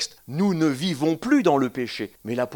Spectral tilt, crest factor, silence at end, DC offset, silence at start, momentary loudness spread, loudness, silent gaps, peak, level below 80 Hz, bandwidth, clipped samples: -5.5 dB/octave; 16 dB; 0 s; under 0.1%; 0 s; 10 LU; -23 LUFS; none; -6 dBFS; -64 dBFS; 19 kHz; under 0.1%